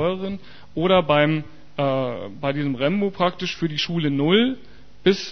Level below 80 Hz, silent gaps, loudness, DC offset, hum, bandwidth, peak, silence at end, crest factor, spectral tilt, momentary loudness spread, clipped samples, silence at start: -54 dBFS; none; -22 LUFS; 1%; none; 6.6 kHz; -4 dBFS; 0 s; 18 dB; -6.5 dB/octave; 11 LU; under 0.1%; 0 s